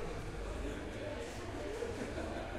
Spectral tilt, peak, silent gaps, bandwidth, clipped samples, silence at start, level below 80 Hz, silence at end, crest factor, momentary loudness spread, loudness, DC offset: -5.5 dB/octave; -28 dBFS; none; 14 kHz; under 0.1%; 0 s; -48 dBFS; 0 s; 14 dB; 3 LU; -43 LUFS; under 0.1%